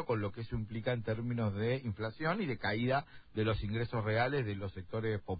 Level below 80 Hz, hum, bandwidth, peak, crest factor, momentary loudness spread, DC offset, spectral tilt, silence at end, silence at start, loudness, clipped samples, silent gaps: -54 dBFS; none; 4.9 kHz; -20 dBFS; 16 dB; 7 LU; under 0.1%; -5.5 dB/octave; 0 s; 0 s; -36 LUFS; under 0.1%; none